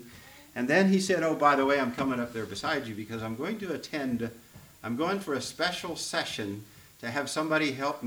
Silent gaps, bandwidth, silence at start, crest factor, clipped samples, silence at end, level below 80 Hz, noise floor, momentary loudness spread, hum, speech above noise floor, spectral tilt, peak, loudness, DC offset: none; over 20 kHz; 0 s; 22 dB; under 0.1%; 0 s; -64 dBFS; -51 dBFS; 14 LU; none; 22 dB; -4.5 dB/octave; -8 dBFS; -29 LUFS; under 0.1%